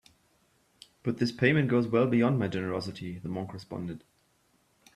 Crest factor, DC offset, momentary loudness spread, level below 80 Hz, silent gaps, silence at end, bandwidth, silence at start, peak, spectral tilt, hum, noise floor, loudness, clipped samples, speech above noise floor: 22 dB; under 0.1%; 14 LU; -64 dBFS; none; 0.95 s; 12 kHz; 1.05 s; -8 dBFS; -7.5 dB/octave; none; -69 dBFS; -29 LUFS; under 0.1%; 41 dB